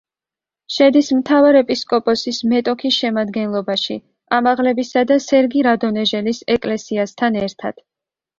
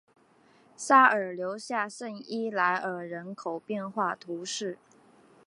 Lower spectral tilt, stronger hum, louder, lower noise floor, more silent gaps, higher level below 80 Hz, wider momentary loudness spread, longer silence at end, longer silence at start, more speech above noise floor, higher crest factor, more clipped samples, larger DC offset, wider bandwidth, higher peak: about the same, -4.5 dB/octave vs -3.5 dB/octave; neither; first, -16 LUFS vs -28 LUFS; first, -89 dBFS vs -62 dBFS; neither; first, -56 dBFS vs -86 dBFS; second, 9 LU vs 18 LU; about the same, 0.65 s vs 0.7 s; about the same, 0.7 s vs 0.8 s; first, 73 dB vs 33 dB; second, 16 dB vs 24 dB; neither; neither; second, 7.6 kHz vs 11.5 kHz; first, -2 dBFS vs -6 dBFS